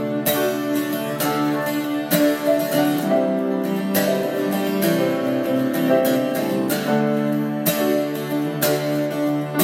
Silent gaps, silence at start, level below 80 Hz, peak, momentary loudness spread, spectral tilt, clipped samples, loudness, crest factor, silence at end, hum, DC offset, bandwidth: none; 0 s; -70 dBFS; -4 dBFS; 4 LU; -5 dB/octave; under 0.1%; -21 LUFS; 16 dB; 0 s; none; under 0.1%; 17 kHz